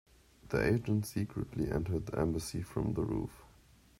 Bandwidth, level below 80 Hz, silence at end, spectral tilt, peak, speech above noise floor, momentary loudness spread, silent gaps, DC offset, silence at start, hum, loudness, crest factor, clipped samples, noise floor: 16 kHz; -50 dBFS; 0.55 s; -7 dB/octave; -18 dBFS; 28 dB; 7 LU; none; under 0.1%; 0.45 s; none; -35 LUFS; 18 dB; under 0.1%; -62 dBFS